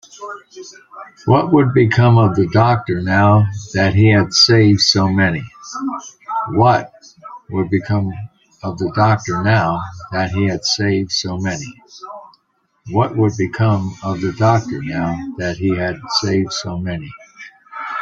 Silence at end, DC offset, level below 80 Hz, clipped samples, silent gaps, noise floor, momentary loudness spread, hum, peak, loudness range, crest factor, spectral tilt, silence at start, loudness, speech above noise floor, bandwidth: 0 s; under 0.1%; -48 dBFS; under 0.1%; none; -64 dBFS; 21 LU; none; 0 dBFS; 7 LU; 16 dB; -5.5 dB/octave; 0.15 s; -16 LUFS; 48 dB; 7.6 kHz